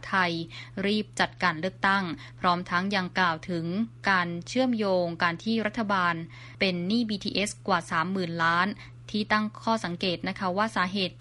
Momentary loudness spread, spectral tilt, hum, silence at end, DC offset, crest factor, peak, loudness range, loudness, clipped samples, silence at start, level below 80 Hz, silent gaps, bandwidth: 6 LU; -5 dB/octave; none; 0 s; under 0.1%; 20 dB; -8 dBFS; 1 LU; -27 LUFS; under 0.1%; 0 s; -60 dBFS; none; 11.5 kHz